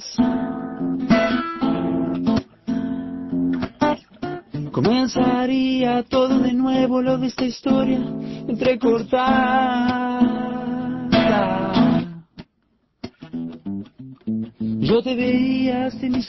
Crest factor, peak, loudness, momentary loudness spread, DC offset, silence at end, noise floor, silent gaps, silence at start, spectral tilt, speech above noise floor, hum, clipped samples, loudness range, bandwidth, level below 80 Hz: 16 dB; -4 dBFS; -21 LUFS; 13 LU; under 0.1%; 0 s; -66 dBFS; none; 0 s; -6.5 dB/octave; 47 dB; none; under 0.1%; 5 LU; 6 kHz; -48 dBFS